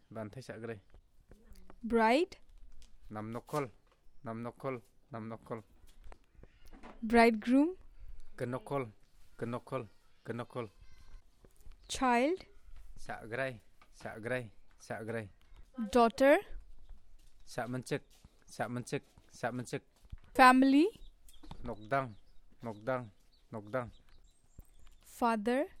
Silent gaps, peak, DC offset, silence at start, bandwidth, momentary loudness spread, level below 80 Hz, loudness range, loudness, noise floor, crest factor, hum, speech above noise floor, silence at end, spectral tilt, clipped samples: none; -12 dBFS; under 0.1%; 0.1 s; 15 kHz; 22 LU; -56 dBFS; 13 LU; -33 LUFS; -60 dBFS; 24 dB; none; 27 dB; 0 s; -5.5 dB/octave; under 0.1%